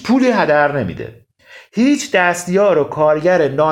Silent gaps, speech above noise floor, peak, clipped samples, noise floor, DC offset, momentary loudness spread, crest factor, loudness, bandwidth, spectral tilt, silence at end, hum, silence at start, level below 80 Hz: none; 29 dB; 0 dBFS; under 0.1%; -43 dBFS; under 0.1%; 12 LU; 14 dB; -14 LUFS; 15.5 kHz; -5.5 dB/octave; 0 s; none; 0 s; -52 dBFS